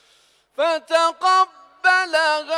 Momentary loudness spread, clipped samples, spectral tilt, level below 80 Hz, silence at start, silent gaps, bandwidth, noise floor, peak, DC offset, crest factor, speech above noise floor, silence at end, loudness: 7 LU; under 0.1%; 0.5 dB/octave; -74 dBFS; 0.6 s; none; 13 kHz; -58 dBFS; -6 dBFS; under 0.1%; 14 dB; 39 dB; 0 s; -19 LUFS